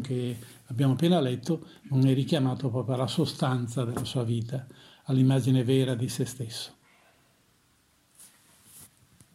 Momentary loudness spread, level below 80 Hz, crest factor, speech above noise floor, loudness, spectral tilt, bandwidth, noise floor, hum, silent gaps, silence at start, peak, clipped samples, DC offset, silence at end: 13 LU; -66 dBFS; 18 dB; 39 dB; -28 LUFS; -7 dB/octave; 14 kHz; -66 dBFS; none; none; 0 s; -12 dBFS; under 0.1%; under 0.1%; 0.5 s